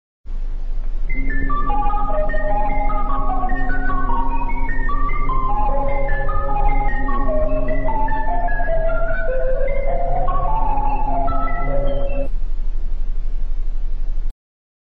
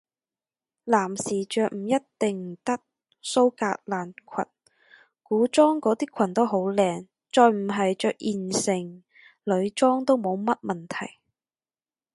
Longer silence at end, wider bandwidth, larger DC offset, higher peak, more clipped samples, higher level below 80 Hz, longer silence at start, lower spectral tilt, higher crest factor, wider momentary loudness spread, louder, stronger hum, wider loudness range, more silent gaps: second, 0.7 s vs 1.05 s; second, 3.4 kHz vs 11.5 kHz; neither; about the same, -4 dBFS vs -4 dBFS; neither; first, -18 dBFS vs -72 dBFS; second, 0.25 s vs 0.85 s; first, -9.5 dB/octave vs -5 dB/octave; second, 12 dB vs 22 dB; second, 8 LU vs 13 LU; about the same, -23 LUFS vs -25 LUFS; neither; about the same, 3 LU vs 5 LU; neither